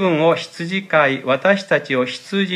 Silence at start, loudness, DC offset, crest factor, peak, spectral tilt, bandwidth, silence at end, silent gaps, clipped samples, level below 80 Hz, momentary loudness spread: 0 s; -18 LUFS; under 0.1%; 16 dB; 0 dBFS; -5.5 dB/octave; 11.5 kHz; 0 s; none; under 0.1%; -68 dBFS; 6 LU